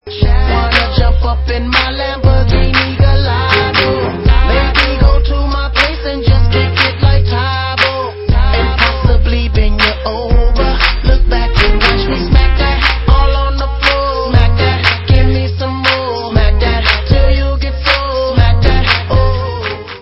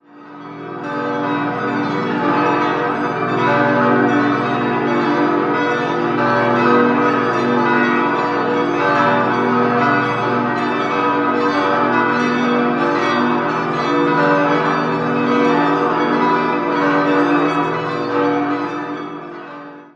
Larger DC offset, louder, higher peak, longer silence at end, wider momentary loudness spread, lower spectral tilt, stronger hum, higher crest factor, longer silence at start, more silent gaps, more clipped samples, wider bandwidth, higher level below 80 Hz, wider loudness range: neither; first, -12 LUFS vs -16 LUFS; about the same, 0 dBFS vs -2 dBFS; about the same, 0 s vs 0.1 s; about the same, 4 LU vs 6 LU; about the same, -7 dB/octave vs -6.5 dB/octave; second, none vs 60 Hz at -45 dBFS; about the same, 10 dB vs 14 dB; about the same, 0.05 s vs 0.15 s; neither; first, 0.3% vs under 0.1%; about the same, 8 kHz vs 8.2 kHz; first, -12 dBFS vs -56 dBFS; about the same, 1 LU vs 2 LU